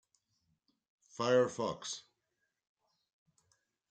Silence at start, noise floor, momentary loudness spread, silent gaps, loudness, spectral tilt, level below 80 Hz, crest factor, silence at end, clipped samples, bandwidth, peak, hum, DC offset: 1.2 s; -85 dBFS; 15 LU; none; -34 LUFS; -4 dB/octave; -82 dBFS; 22 dB; 1.9 s; under 0.1%; 9.2 kHz; -18 dBFS; none; under 0.1%